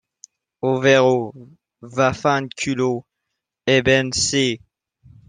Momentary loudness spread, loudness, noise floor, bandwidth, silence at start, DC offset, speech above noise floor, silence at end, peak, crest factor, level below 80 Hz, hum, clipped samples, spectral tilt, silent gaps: 13 LU; -19 LUFS; -80 dBFS; 10 kHz; 0.65 s; under 0.1%; 61 dB; 0.7 s; -2 dBFS; 18 dB; -52 dBFS; none; under 0.1%; -4 dB/octave; none